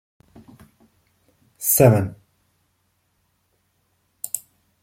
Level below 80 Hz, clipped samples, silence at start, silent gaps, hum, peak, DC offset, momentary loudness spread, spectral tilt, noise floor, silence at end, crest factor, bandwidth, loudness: -56 dBFS; under 0.1%; 1.6 s; none; none; -2 dBFS; under 0.1%; 17 LU; -6 dB/octave; -69 dBFS; 0.45 s; 24 dB; 16.5 kHz; -19 LUFS